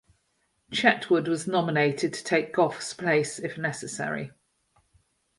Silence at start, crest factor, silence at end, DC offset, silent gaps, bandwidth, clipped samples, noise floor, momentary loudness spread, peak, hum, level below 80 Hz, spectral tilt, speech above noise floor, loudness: 0.7 s; 24 dB; 1.1 s; under 0.1%; none; 11.5 kHz; under 0.1%; -73 dBFS; 9 LU; -4 dBFS; none; -68 dBFS; -4.5 dB/octave; 47 dB; -26 LUFS